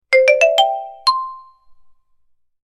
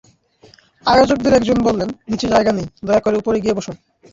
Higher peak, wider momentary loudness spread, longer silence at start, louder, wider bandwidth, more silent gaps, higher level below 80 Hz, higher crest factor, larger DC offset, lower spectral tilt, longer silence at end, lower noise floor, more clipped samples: about the same, 0 dBFS vs -2 dBFS; about the same, 11 LU vs 10 LU; second, 0.1 s vs 0.85 s; about the same, -15 LUFS vs -16 LUFS; first, 13 kHz vs 7.8 kHz; neither; second, -64 dBFS vs -42 dBFS; about the same, 18 dB vs 16 dB; neither; second, 2.5 dB/octave vs -5.5 dB/octave; first, 1.25 s vs 0.4 s; first, -57 dBFS vs -50 dBFS; neither